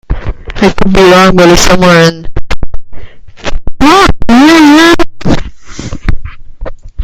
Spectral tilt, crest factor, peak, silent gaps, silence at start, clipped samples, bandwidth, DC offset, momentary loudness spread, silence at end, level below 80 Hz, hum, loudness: -5 dB/octave; 6 dB; 0 dBFS; none; 0.1 s; 9%; 15.5 kHz; under 0.1%; 22 LU; 0 s; -18 dBFS; none; -5 LUFS